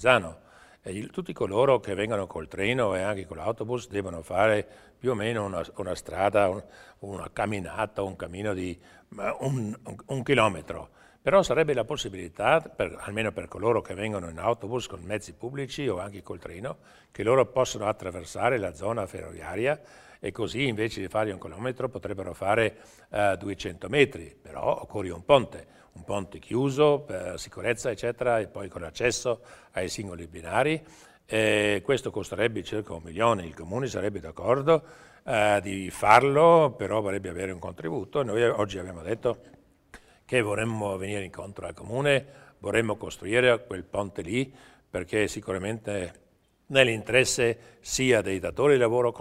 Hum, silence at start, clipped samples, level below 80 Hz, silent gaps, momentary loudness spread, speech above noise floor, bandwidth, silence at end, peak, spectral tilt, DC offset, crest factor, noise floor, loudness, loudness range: none; 0 s; under 0.1%; -54 dBFS; none; 14 LU; 26 dB; 16 kHz; 0 s; -2 dBFS; -5 dB/octave; under 0.1%; 24 dB; -54 dBFS; -27 LUFS; 7 LU